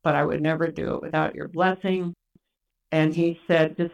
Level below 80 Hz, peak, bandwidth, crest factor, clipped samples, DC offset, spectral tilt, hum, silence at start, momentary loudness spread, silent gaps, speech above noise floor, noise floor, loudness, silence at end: -56 dBFS; -8 dBFS; 9.6 kHz; 16 dB; under 0.1%; under 0.1%; -8 dB/octave; none; 0.05 s; 6 LU; none; 56 dB; -80 dBFS; -24 LUFS; 0 s